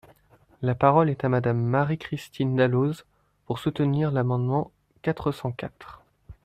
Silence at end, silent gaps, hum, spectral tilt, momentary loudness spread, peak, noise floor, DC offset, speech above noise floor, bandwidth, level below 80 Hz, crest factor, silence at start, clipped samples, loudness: 0.15 s; none; none; -8.5 dB/octave; 13 LU; -4 dBFS; -58 dBFS; under 0.1%; 34 dB; 13.5 kHz; -56 dBFS; 22 dB; 0.6 s; under 0.1%; -25 LUFS